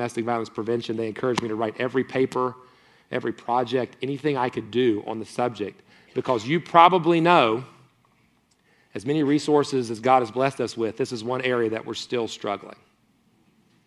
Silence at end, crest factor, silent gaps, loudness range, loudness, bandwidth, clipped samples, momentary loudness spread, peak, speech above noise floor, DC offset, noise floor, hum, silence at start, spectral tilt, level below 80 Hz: 1.15 s; 24 dB; none; 6 LU; -24 LUFS; 12 kHz; under 0.1%; 13 LU; 0 dBFS; 40 dB; under 0.1%; -64 dBFS; none; 0 s; -5.5 dB/octave; -68 dBFS